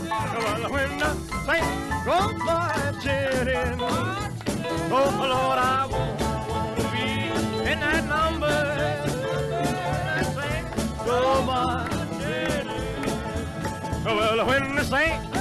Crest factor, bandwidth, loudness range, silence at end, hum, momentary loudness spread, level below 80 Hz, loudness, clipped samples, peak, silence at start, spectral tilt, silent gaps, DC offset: 14 dB; 14.5 kHz; 2 LU; 0 s; none; 7 LU; -40 dBFS; -25 LUFS; under 0.1%; -12 dBFS; 0 s; -5 dB/octave; none; under 0.1%